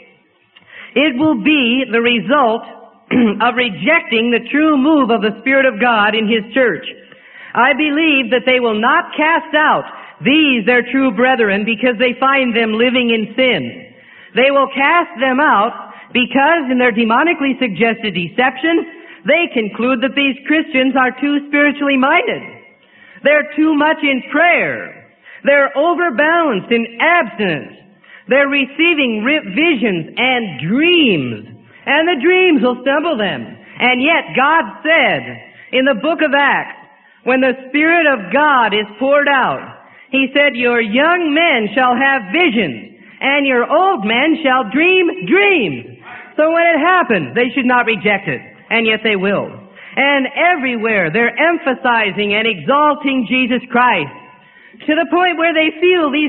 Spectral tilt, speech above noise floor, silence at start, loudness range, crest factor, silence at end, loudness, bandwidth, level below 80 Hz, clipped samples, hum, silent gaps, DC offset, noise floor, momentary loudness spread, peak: -10 dB/octave; 38 dB; 0.75 s; 2 LU; 14 dB; 0 s; -13 LUFS; 4.3 kHz; -60 dBFS; under 0.1%; none; none; under 0.1%; -52 dBFS; 7 LU; 0 dBFS